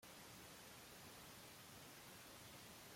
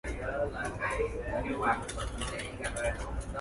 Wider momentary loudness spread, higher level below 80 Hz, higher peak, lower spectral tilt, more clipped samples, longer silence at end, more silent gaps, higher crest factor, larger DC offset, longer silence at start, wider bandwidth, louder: second, 0 LU vs 6 LU; second, -80 dBFS vs -42 dBFS; second, -48 dBFS vs -16 dBFS; second, -2.5 dB/octave vs -4.5 dB/octave; neither; about the same, 0 s vs 0 s; neither; second, 12 dB vs 20 dB; neither; about the same, 0 s vs 0.05 s; first, 16.5 kHz vs 11.5 kHz; second, -58 LUFS vs -34 LUFS